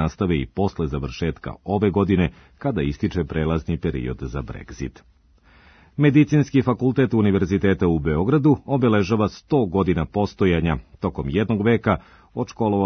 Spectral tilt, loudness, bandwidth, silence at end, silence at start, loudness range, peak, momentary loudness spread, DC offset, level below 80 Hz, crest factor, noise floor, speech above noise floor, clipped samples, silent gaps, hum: -8 dB/octave; -21 LUFS; 6.6 kHz; 0 s; 0 s; 6 LU; -4 dBFS; 12 LU; under 0.1%; -40 dBFS; 18 dB; -54 dBFS; 33 dB; under 0.1%; none; none